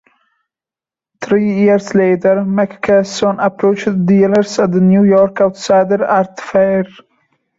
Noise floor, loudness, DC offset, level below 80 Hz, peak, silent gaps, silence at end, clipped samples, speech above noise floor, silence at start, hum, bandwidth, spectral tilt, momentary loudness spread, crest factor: -89 dBFS; -13 LUFS; under 0.1%; -54 dBFS; -2 dBFS; none; 0.7 s; under 0.1%; 77 dB; 1.2 s; none; 7.8 kHz; -7 dB/octave; 6 LU; 12 dB